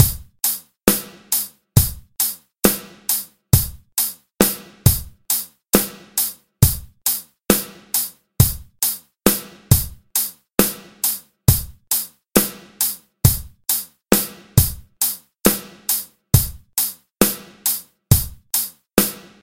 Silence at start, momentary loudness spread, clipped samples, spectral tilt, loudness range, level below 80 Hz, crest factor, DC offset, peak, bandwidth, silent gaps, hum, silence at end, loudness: 0 s; 5 LU; under 0.1%; -4 dB/octave; 1 LU; -34 dBFS; 20 dB; under 0.1%; 0 dBFS; 17.5 kHz; none; none; 0.2 s; -20 LUFS